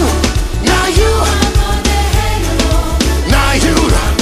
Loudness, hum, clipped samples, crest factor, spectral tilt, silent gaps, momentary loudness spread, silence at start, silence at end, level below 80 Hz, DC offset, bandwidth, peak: -12 LUFS; none; under 0.1%; 12 dB; -4.5 dB/octave; none; 3 LU; 0 s; 0 s; -14 dBFS; under 0.1%; 15.5 kHz; 0 dBFS